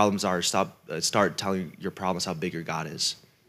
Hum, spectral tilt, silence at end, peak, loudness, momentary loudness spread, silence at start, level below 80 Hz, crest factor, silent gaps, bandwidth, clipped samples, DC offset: none; -3.5 dB/octave; 0.3 s; -6 dBFS; -28 LUFS; 8 LU; 0 s; -70 dBFS; 22 dB; none; 16 kHz; under 0.1%; under 0.1%